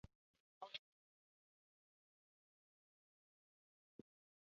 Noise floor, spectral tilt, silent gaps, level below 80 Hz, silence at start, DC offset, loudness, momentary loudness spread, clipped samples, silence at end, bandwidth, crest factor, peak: under -90 dBFS; -1 dB/octave; 0.15-0.34 s, 0.40-0.61 s; -84 dBFS; 0.05 s; under 0.1%; -55 LUFS; 15 LU; under 0.1%; 3.7 s; 6.4 kHz; 30 dB; -36 dBFS